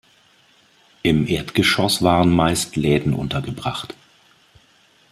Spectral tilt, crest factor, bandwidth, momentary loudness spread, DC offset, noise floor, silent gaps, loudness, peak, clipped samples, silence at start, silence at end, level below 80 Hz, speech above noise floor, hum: -5 dB/octave; 20 dB; 15 kHz; 11 LU; under 0.1%; -56 dBFS; none; -19 LUFS; -2 dBFS; under 0.1%; 1.05 s; 1.2 s; -44 dBFS; 37 dB; none